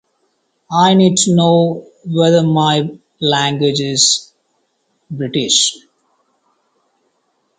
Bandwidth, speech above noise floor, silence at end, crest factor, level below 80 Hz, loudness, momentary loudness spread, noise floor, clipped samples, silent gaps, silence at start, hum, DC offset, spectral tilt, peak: 9.6 kHz; 51 dB; 1.8 s; 16 dB; -58 dBFS; -13 LUFS; 10 LU; -65 dBFS; under 0.1%; none; 0.7 s; none; under 0.1%; -4 dB/octave; 0 dBFS